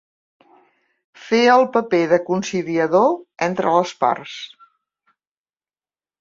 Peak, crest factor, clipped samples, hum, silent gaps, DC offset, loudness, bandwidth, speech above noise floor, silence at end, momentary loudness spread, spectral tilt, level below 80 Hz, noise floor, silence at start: -2 dBFS; 18 dB; under 0.1%; none; none; under 0.1%; -18 LUFS; 7.6 kHz; over 72 dB; 1.75 s; 12 LU; -5 dB/octave; -66 dBFS; under -90 dBFS; 1.2 s